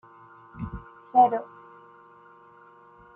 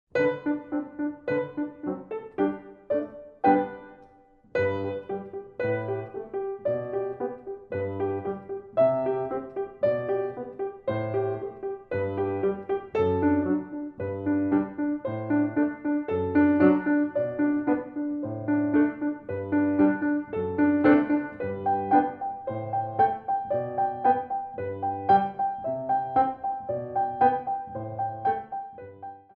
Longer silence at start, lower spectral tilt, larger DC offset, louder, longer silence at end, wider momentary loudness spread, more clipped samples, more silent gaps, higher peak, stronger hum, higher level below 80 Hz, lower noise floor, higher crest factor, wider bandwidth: first, 0.55 s vs 0.15 s; about the same, -9.5 dB/octave vs -10 dB/octave; neither; first, -24 LUFS vs -27 LUFS; first, 1.7 s vs 0.15 s; first, 25 LU vs 12 LU; neither; neither; about the same, -8 dBFS vs -8 dBFS; neither; first, -54 dBFS vs -62 dBFS; second, -53 dBFS vs -57 dBFS; about the same, 22 dB vs 18 dB; second, 3.2 kHz vs 4.5 kHz